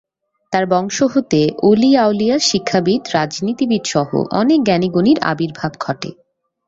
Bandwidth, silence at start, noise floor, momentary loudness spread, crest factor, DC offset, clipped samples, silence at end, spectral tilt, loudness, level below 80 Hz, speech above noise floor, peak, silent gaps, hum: 7.8 kHz; 0.5 s; -39 dBFS; 9 LU; 14 dB; under 0.1%; under 0.1%; 0.55 s; -5 dB/octave; -16 LUFS; -54 dBFS; 24 dB; -2 dBFS; none; none